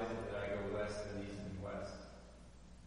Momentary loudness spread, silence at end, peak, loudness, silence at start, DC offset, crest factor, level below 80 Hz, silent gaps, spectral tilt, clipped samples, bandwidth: 18 LU; 0 s; -28 dBFS; -44 LUFS; 0 s; under 0.1%; 16 dB; -58 dBFS; none; -6 dB/octave; under 0.1%; 10.5 kHz